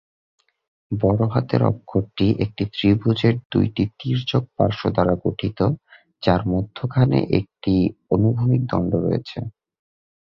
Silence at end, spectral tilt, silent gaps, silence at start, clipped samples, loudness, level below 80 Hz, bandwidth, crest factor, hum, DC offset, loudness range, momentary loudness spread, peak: 0.85 s; -9.5 dB/octave; 3.45-3.50 s; 0.9 s; under 0.1%; -21 LUFS; -42 dBFS; 6 kHz; 18 dB; none; under 0.1%; 1 LU; 6 LU; -2 dBFS